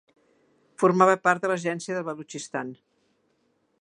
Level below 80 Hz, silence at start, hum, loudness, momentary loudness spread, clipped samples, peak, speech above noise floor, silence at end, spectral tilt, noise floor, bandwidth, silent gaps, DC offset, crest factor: -78 dBFS; 0.8 s; none; -25 LUFS; 15 LU; under 0.1%; -4 dBFS; 46 dB; 1.05 s; -5.5 dB/octave; -70 dBFS; 11 kHz; none; under 0.1%; 24 dB